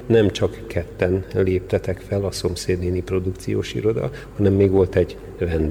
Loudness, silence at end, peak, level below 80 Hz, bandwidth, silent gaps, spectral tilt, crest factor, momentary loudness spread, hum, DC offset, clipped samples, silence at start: -22 LUFS; 0 s; -4 dBFS; -38 dBFS; 18 kHz; none; -7 dB/octave; 16 dB; 9 LU; none; under 0.1%; under 0.1%; 0 s